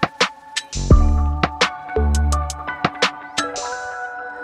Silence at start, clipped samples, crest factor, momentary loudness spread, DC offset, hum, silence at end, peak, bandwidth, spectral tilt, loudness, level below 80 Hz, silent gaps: 0 s; under 0.1%; 18 dB; 11 LU; under 0.1%; none; 0 s; -2 dBFS; 12 kHz; -4.5 dB/octave; -21 LUFS; -22 dBFS; none